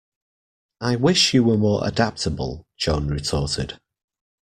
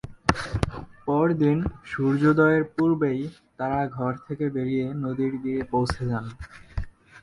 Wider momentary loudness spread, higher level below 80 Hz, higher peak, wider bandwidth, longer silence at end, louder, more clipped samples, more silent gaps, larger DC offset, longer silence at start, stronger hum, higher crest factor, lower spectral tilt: second, 13 LU vs 16 LU; about the same, -40 dBFS vs -42 dBFS; second, -4 dBFS vs 0 dBFS; first, 14 kHz vs 11.5 kHz; first, 0.7 s vs 0 s; first, -21 LUFS vs -25 LUFS; neither; neither; neither; first, 0.8 s vs 0.05 s; neither; about the same, 20 dB vs 24 dB; second, -5 dB/octave vs -7.5 dB/octave